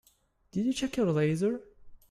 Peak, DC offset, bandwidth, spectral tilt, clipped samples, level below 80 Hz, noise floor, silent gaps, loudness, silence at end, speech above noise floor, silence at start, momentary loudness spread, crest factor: -16 dBFS; under 0.1%; 15 kHz; -6.5 dB/octave; under 0.1%; -60 dBFS; -68 dBFS; none; -30 LUFS; 0.15 s; 39 dB; 0.55 s; 9 LU; 16 dB